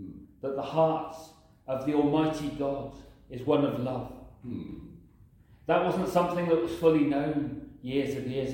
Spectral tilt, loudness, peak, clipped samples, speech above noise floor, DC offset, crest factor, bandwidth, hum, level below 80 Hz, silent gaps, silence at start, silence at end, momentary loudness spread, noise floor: -7 dB/octave; -29 LUFS; -10 dBFS; under 0.1%; 29 dB; under 0.1%; 20 dB; 16.5 kHz; none; -56 dBFS; none; 0 s; 0 s; 18 LU; -57 dBFS